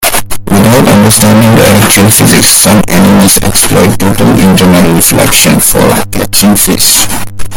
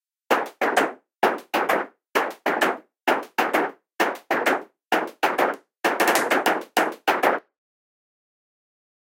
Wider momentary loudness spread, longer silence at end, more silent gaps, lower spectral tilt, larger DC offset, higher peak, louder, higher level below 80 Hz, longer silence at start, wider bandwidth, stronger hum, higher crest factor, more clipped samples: about the same, 5 LU vs 5 LU; second, 0 s vs 1.8 s; neither; first, -4 dB/octave vs -2.5 dB/octave; neither; about the same, 0 dBFS vs 0 dBFS; first, -4 LUFS vs -23 LUFS; first, -24 dBFS vs -72 dBFS; second, 0 s vs 0.3 s; first, over 20 kHz vs 17 kHz; neither; second, 4 dB vs 24 dB; first, 9% vs under 0.1%